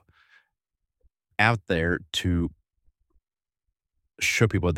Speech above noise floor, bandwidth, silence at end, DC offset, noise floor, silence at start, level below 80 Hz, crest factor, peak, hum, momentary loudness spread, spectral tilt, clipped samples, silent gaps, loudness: 62 dB; 16.5 kHz; 0 s; under 0.1%; -86 dBFS; 1.4 s; -46 dBFS; 24 dB; -4 dBFS; none; 7 LU; -5 dB/octave; under 0.1%; none; -25 LUFS